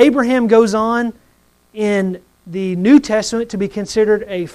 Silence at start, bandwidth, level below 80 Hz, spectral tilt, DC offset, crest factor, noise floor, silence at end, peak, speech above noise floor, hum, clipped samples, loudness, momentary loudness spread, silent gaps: 0 s; 12.5 kHz; -50 dBFS; -5.5 dB/octave; under 0.1%; 14 dB; -55 dBFS; 0.05 s; 0 dBFS; 40 dB; none; under 0.1%; -15 LUFS; 12 LU; none